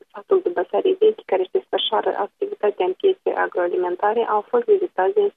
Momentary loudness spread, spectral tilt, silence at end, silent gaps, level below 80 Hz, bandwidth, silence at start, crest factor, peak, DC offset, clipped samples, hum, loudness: 5 LU; -6.5 dB/octave; 0.05 s; none; -76 dBFS; 3.9 kHz; 0.15 s; 14 dB; -6 dBFS; under 0.1%; under 0.1%; none; -21 LUFS